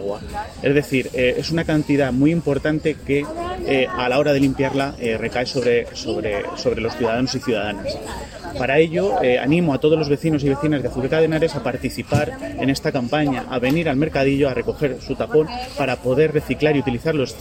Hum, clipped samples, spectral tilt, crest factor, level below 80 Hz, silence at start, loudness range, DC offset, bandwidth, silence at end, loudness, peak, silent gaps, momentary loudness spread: none; under 0.1%; -6.5 dB/octave; 16 dB; -42 dBFS; 0 s; 3 LU; under 0.1%; 16.5 kHz; 0 s; -20 LUFS; -4 dBFS; none; 8 LU